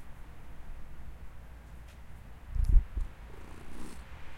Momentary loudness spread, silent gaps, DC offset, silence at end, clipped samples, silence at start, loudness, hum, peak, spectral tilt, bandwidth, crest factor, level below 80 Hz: 21 LU; none; under 0.1%; 0 s; under 0.1%; 0 s; -37 LUFS; none; -10 dBFS; -6.5 dB/octave; 11.5 kHz; 24 dB; -34 dBFS